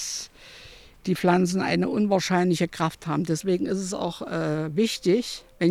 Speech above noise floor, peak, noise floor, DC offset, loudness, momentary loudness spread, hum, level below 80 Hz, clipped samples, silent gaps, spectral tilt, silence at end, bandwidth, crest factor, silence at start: 24 dB; -8 dBFS; -48 dBFS; under 0.1%; -25 LUFS; 12 LU; none; -56 dBFS; under 0.1%; none; -5.5 dB/octave; 0 s; 15.5 kHz; 18 dB; 0 s